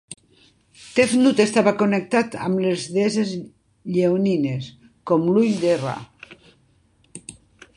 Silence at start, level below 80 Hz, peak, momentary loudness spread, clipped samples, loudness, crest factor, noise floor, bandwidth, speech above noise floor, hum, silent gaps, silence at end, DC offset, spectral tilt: 0.1 s; -62 dBFS; -2 dBFS; 22 LU; under 0.1%; -20 LUFS; 20 dB; -60 dBFS; 11.5 kHz; 40 dB; none; none; 0.45 s; under 0.1%; -5.5 dB/octave